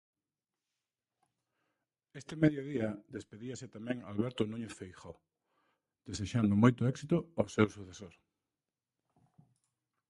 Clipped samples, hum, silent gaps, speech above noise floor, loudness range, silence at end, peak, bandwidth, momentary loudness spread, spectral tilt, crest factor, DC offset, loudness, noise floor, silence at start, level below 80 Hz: under 0.1%; none; none; over 56 dB; 7 LU; 2 s; -12 dBFS; 11.5 kHz; 23 LU; -7 dB/octave; 26 dB; under 0.1%; -34 LUFS; under -90 dBFS; 2.15 s; -62 dBFS